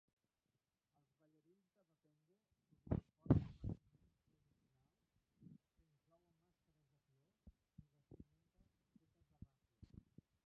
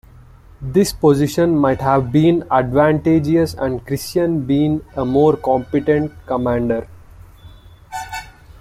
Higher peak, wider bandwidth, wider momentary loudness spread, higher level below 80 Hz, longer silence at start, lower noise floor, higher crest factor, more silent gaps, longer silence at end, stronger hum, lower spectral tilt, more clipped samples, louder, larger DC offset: second, -20 dBFS vs -2 dBFS; second, 5.6 kHz vs 15.5 kHz; first, 28 LU vs 9 LU; second, -62 dBFS vs -42 dBFS; first, 2.85 s vs 0.6 s; first, under -90 dBFS vs -43 dBFS; first, 32 dB vs 16 dB; neither; first, 4.9 s vs 0.1 s; neither; first, -11 dB/octave vs -7 dB/octave; neither; second, -43 LUFS vs -17 LUFS; neither